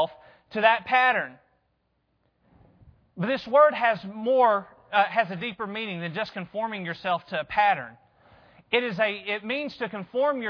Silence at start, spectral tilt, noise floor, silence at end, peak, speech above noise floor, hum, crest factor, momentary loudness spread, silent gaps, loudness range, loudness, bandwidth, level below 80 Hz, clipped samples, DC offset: 0 s; -6.5 dB/octave; -72 dBFS; 0 s; -4 dBFS; 47 dB; none; 22 dB; 12 LU; none; 4 LU; -25 LUFS; 5.4 kHz; -66 dBFS; under 0.1%; under 0.1%